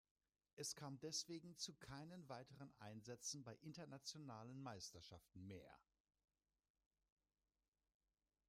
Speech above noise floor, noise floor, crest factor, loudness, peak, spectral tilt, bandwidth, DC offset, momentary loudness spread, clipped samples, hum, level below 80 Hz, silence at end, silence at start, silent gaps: over 34 dB; under -90 dBFS; 22 dB; -55 LUFS; -36 dBFS; -3 dB/octave; 15.5 kHz; under 0.1%; 12 LU; under 0.1%; none; -84 dBFS; 2.65 s; 0.55 s; none